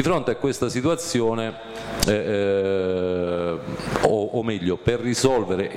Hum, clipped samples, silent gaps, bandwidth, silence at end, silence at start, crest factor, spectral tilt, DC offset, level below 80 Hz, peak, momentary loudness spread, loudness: none; under 0.1%; none; 16 kHz; 0 s; 0 s; 18 dB; -5 dB/octave; under 0.1%; -44 dBFS; -4 dBFS; 7 LU; -23 LUFS